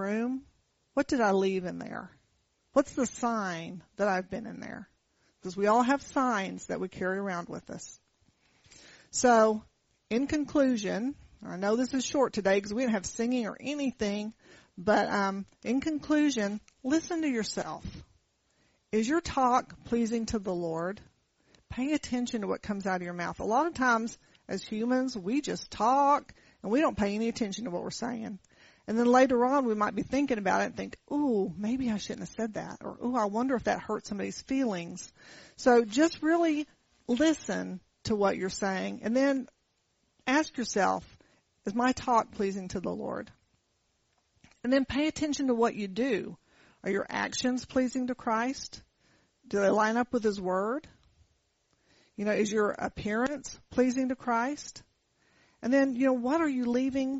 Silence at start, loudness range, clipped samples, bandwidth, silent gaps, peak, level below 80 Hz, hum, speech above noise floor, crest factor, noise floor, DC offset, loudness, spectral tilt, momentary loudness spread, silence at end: 0 s; 4 LU; under 0.1%; 8 kHz; none; -12 dBFS; -60 dBFS; none; 45 dB; 20 dB; -75 dBFS; under 0.1%; -30 LUFS; -4 dB/octave; 14 LU; 0 s